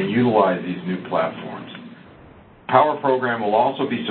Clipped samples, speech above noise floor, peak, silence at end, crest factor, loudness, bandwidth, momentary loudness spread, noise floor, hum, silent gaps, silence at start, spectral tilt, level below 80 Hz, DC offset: under 0.1%; 27 dB; 0 dBFS; 0 s; 20 dB; -20 LUFS; 4.4 kHz; 18 LU; -46 dBFS; none; none; 0 s; -11 dB/octave; -60 dBFS; under 0.1%